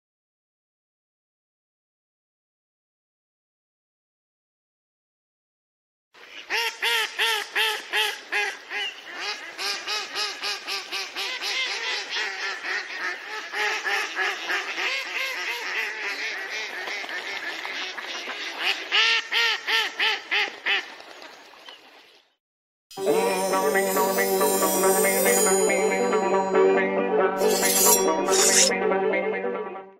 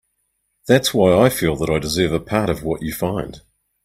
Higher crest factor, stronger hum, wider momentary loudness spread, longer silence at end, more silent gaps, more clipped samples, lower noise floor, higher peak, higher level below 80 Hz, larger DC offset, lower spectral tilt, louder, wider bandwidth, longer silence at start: about the same, 22 dB vs 20 dB; neither; about the same, 11 LU vs 11 LU; second, 0.1 s vs 0.45 s; first, 22.40-22.90 s vs none; neither; second, -54 dBFS vs -70 dBFS; second, -4 dBFS vs 0 dBFS; second, -70 dBFS vs -42 dBFS; neither; second, -1 dB/octave vs -5 dB/octave; second, -23 LUFS vs -18 LUFS; about the same, 16 kHz vs 16 kHz; first, 6.15 s vs 0.65 s